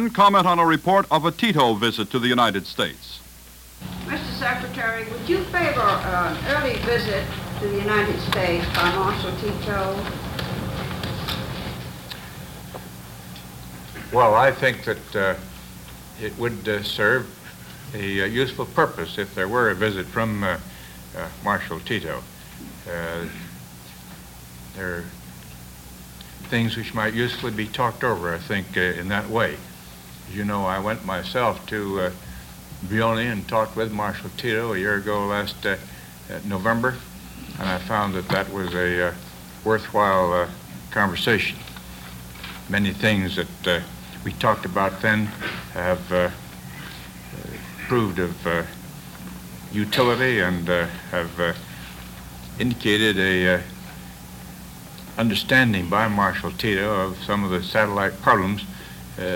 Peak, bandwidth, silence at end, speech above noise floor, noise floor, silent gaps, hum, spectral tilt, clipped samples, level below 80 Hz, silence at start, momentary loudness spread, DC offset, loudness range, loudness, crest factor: -2 dBFS; 17 kHz; 0 s; 22 dB; -44 dBFS; none; none; -5 dB/octave; under 0.1%; -44 dBFS; 0 s; 20 LU; under 0.1%; 7 LU; -23 LUFS; 22 dB